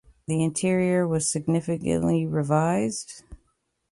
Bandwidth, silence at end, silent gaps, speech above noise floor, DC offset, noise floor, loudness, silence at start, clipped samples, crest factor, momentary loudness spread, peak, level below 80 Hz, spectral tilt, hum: 11.5 kHz; 0.55 s; none; 48 dB; under 0.1%; -72 dBFS; -24 LUFS; 0.3 s; under 0.1%; 14 dB; 7 LU; -10 dBFS; -52 dBFS; -6 dB/octave; none